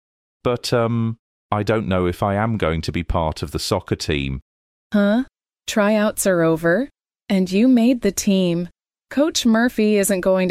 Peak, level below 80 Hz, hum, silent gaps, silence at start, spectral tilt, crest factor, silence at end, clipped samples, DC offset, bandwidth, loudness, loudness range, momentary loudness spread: -6 dBFS; -38 dBFS; none; 1.19-1.49 s, 4.42-4.90 s; 0.45 s; -5.5 dB/octave; 14 dB; 0 s; under 0.1%; under 0.1%; 16 kHz; -19 LUFS; 4 LU; 9 LU